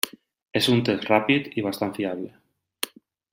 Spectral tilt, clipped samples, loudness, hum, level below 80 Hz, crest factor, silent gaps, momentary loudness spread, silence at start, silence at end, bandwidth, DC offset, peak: -4.5 dB/octave; under 0.1%; -24 LUFS; none; -64 dBFS; 24 dB; 0.42-0.46 s; 12 LU; 0.05 s; 0.45 s; 16.5 kHz; under 0.1%; -2 dBFS